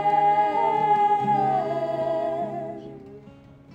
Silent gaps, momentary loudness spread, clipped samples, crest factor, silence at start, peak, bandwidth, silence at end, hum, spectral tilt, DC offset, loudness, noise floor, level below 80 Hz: none; 16 LU; under 0.1%; 12 dB; 0 s; -10 dBFS; 8 kHz; 0 s; none; -7 dB/octave; under 0.1%; -23 LUFS; -48 dBFS; -64 dBFS